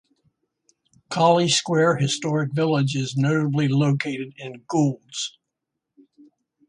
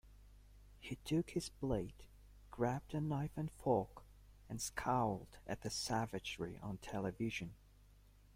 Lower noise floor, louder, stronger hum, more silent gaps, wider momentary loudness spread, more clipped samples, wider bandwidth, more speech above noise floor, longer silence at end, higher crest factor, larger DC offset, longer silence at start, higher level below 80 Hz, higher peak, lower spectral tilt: first, -82 dBFS vs -65 dBFS; first, -22 LUFS vs -42 LUFS; second, none vs 50 Hz at -60 dBFS; neither; about the same, 12 LU vs 13 LU; neither; second, 11 kHz vs 16.5 kHz; first, 61 dB vs 24 dB; first, 1.4 s vs 0.35 s; about the same, 18 dB vs 20 dB; neither; first, 1.1 s vs 0.05 s; about the same, -64 dBFS vs -60 dBFS; first, -6 dBFS vs -22 dBFS; about the same, -5 dB/octave vs -5.5 dB/octave